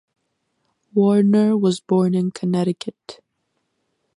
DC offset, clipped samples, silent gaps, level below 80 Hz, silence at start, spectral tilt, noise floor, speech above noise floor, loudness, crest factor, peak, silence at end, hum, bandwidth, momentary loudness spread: under 0.1%; under 0.1%; none; -68 dBFS; 0.95 s; -7.5 dB/octave; -73 dBFS; 55 dB; -19 LUFS; 14 dB; -6 dBFS; 1.05 s; none; 11 kHz; 9 LU